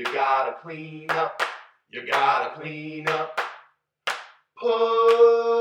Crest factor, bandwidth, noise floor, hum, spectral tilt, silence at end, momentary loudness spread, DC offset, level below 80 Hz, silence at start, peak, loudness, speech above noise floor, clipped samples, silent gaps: 18 dB; 12 kHz; -56 dBFS; none; -4 dB/octave; 0 s; 18 LU; under 0.1%; -82 dBFS; 0 s; -6 dBFS; -23 LUFS; 34 dB; under 0.1%; none